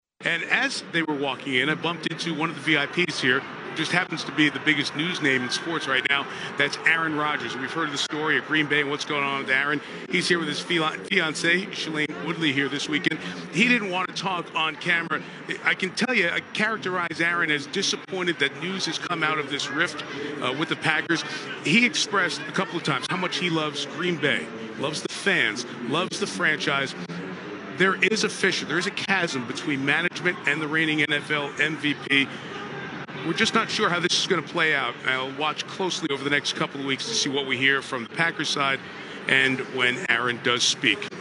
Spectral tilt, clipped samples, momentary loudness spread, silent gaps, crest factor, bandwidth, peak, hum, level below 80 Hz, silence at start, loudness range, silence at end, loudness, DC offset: -3 dB/octave; under 0.1%; 7 LU; none; 22 dB; 11.5 kHz; -4 dBFS; none; -74 dBFS; 0.2 s; 2 LU; 0 s; -24 LUFS; under 0.1%